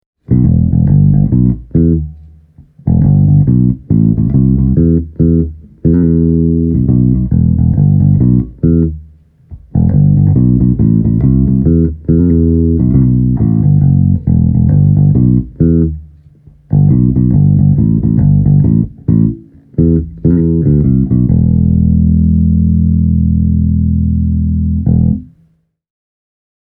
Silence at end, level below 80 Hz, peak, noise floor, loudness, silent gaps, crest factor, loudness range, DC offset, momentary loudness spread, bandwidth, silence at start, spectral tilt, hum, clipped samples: 1.55 s; -20 dBFS; 0 dBFS; -53 dBFS; -11 LUFS; none; 10 dB; 2 LU; under 0.1%; 5 LU; 2.1 kHz; 0.3 s; -16 dB/octave; none; under 0.1%